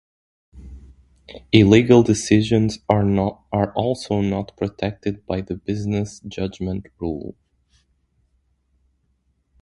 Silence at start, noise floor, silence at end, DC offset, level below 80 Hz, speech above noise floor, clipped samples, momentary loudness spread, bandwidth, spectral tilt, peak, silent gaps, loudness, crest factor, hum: 0.55 s; -67 dBFS; 2.3 s; under 0.1%; -44 dBFS; 47 dB; under 0.1%; 15 LU; 11.5 kHz; -6.5 dB/octave; 0 dBFS; none; -20 LUFS; 22 dB; none